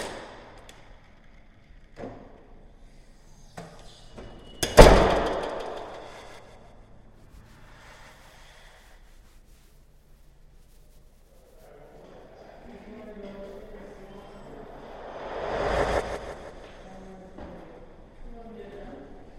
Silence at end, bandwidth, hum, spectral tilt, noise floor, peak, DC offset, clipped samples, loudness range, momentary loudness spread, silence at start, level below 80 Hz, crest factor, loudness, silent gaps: 0.25 s; 16 kHz; none; -5 dB/octave; -54 dBFS; 0 dBFS; under 0.1%; under 0.1%; 25 LU; 25 LU; 0 s; -34 dBFS; 30 dB; -22 LUFS; none